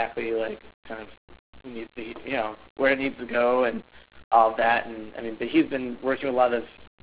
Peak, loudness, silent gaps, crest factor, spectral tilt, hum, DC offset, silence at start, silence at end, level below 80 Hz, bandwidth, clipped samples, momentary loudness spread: -6 dBFS; -25 LUFS; 0.74-0.83 s, 1.17-1.28 s, 1.39-1.53 s, 2.70-2.76 s, 4.24-4.31 s; 20 dB; -8.5 dB/octave; none; 0.3%; 0 s; 0.2 s; -58 dBFS; 4 kHz; under 0.1%; 19 LU